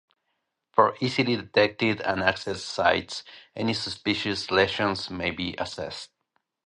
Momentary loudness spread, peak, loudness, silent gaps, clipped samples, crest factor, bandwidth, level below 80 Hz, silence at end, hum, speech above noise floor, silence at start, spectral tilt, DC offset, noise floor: 13 LU; -4 dBFS; -26 LUFS; none; under 0.1%; 24 dB; 11 kHz; -54 dBFS; 0.6 s; none; 53 dB; 0.75 s; -4.5 dB/octave; under 0.1%; -79 dBFS